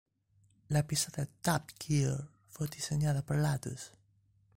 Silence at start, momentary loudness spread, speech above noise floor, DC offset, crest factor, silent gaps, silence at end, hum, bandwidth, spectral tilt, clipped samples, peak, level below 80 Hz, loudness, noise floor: 0.7 s; 11 LU; 37 dB; under 0.1%; 18 dB; none; 0.7 s; none; 16.5 kHz; -5 dB/octave; under 0.1%; -16 dBFS; -58 dBFS; -34 LUFS; -70 dBFS